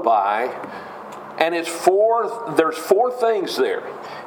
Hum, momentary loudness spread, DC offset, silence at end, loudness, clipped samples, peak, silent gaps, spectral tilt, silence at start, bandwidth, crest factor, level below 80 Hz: none; 16 LU; under 0.1%; 0 s; -20 LUFS; under 0.1%; 0 dBFS; none; -3.5 dB/octave; 0 s; 19 kHz; 20 dB; -72 dBFS